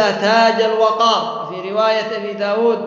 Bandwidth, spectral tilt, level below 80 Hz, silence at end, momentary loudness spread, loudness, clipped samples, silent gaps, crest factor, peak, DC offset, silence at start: 7.6 kHz; -4 dB/octave; -70 dBFS; 0 s; 10 LU; -16 LUFS; under 0.1%; none; 14 dB; -2 dBFS; under 0.1%; 0 s